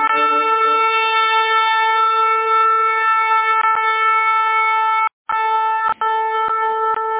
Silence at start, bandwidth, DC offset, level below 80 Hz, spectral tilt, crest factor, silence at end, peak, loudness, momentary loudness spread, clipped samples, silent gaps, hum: 0 s; 4 kHz; under 0.1%; -66 dBFS; -3.5 dB/octave; 10 dB; 0 s; -6 dBFS; -15 LUFS; 4 LU; under 0.1%; 5.13-5.25 s; none